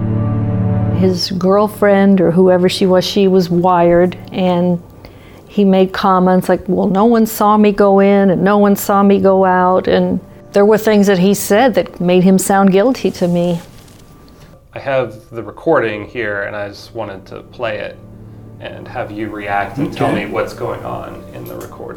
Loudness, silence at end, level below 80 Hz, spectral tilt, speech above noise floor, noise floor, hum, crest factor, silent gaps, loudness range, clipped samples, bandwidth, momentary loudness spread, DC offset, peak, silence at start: -13 LUFS; 0 s; -42 dBFS; -6.5 dB/octave; 28 dB; -40 dBFS; none; 12 dB; none; 10 LU; under 0.1%; 19.5 kHz; 16 LU; under 0.1%; 0 dBFS; 0 s